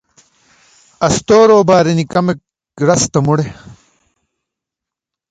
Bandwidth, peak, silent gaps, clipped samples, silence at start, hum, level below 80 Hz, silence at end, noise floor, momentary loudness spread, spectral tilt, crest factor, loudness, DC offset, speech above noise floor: 9.4 kHz; 0 dBFS; none; under 0.1%; 1 s; none; -46 dBFS; 1.55 s; -84 dBFS; 11 LU; -5.5 dB/octave; 14 dB; -12 LUFS; under 0.1%; 73 dB